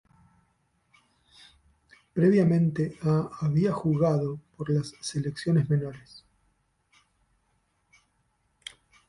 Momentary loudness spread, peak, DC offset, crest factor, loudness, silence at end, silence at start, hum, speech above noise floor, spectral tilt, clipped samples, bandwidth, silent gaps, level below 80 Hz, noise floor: 20 LU; -12 dBFS; under 0.1%; 18 dB; -26 LUFS; 3.1 s; 2.15 s; none; 47 dB; -7.5 dB/octave; under 0.1%; 11 kHz; none; -60 dBFS; -72 dBFS